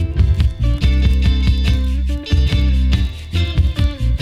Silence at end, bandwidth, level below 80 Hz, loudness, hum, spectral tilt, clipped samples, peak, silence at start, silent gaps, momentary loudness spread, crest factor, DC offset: 0 s; 7.6 kHz; -16 dBFS; -17 LUFS; none; -6.5 dB/octave; under 0.1%; -4 dBFS; 0 s; none; 4 LU; 12 dB; under 0.1%